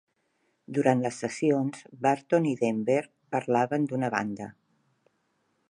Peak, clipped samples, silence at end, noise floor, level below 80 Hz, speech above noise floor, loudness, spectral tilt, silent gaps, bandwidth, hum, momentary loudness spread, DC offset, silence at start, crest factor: -8 dBFS; under 0.1%; 1.2 s; -74 dBFS; -74 dBFS; 47 dB; -28 LUFS; -6.5 dB/octave; none; 11 kHz; none; 9 LU; under 0.1%; 0.7 s; 22 dB